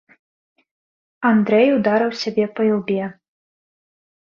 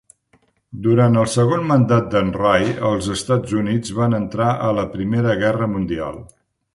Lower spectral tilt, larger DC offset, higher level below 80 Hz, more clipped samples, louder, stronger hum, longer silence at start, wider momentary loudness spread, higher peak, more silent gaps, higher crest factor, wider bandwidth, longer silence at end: about the same, -6.5 dB/octave vs -6.5 dB/octave; neither; second, -64 dBFS vs -44 dBFS; neither; about the same, -18 LUFS vs -18 LUFS; neither; first, 1.2 s vs 0.75 s; about the same, 9 LU vs 8 LU; about the same, -4 dBFS vs -2 dBFS; neither; about the same, 18 dB vs 16 dB; second, 7 kHz vs 11.5 kHz; first, 1.2 s vs 0.5 s